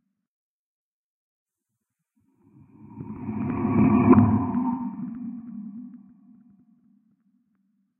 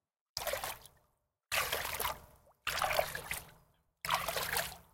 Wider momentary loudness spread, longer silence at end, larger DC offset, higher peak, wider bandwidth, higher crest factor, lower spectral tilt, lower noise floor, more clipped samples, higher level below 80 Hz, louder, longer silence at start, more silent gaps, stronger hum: first, 23 LU vs 10 LU; first, 2 s vs 0.1 s; neither; first, -4 dBFS vs -16 dBFS; second, 3 kHz vs 17 kHz; about the same, 24 dB vs 24 dB; first, -13 dB/octave vs -1 dB/octave; first, -83 dBFS vs -78 dBFS; neither; first, -52 dBFS vs -60 dBFS; first, -22 LUFS vs -36 LUFS; first, 2.85 s vs 0.35 s; neither; neither